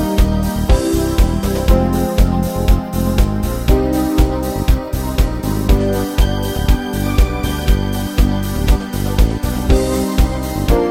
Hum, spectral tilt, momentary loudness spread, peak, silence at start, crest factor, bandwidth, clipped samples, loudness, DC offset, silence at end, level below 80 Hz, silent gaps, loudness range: none; -6.5 dB/octave; 4 LU; 0 dBFS; 0 s; 14 dB; 16.5 kHz; under 0.1%; -17 LUFS; under 0.1%; 0 s; -16 dBFS; none; 1 LU